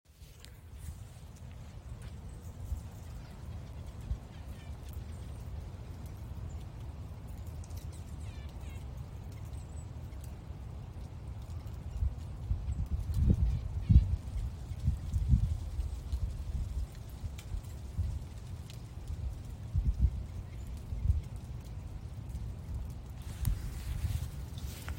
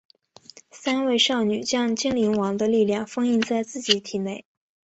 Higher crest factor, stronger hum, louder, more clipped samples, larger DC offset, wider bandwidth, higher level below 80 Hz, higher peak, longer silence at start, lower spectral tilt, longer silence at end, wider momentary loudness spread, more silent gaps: about the same, 26 dB vs 22 dB; neither; second, -39 LUFS vs -23 LUFS; neither; neither; first, 16 kHz vs 8.2 kHz; first, -38 dBFS vs -64 dBFS; second, -10 dBFS vs -2 dBFS; second, 0.1 s vs 0.75 s; first, -7 dB/octave vs -3.5 dB/octave; second, 0 s vs 0.55 s; first, 14 LU vs 10 LU; neither